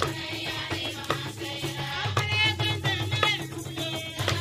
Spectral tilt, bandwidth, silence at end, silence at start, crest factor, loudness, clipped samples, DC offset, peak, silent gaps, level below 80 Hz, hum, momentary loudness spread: -4 dB/octave; 15.5 kHz; 0 s; 0 s; 24 dB; -28 LUFS; under 0.1%; under 0.1%; -6 dBFS; none; -54 dBFS; none; 8 LU